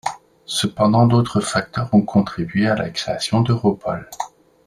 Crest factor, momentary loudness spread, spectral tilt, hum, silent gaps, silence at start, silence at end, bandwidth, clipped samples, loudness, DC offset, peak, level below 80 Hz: 16 dB; 14 LU; -6 dB/octave; none; none; 0.05 s; 0.4 s; 13 kHz; under 0.1%; -19 LUFS; under 0.1%; -2 dBFS; -50 dBFS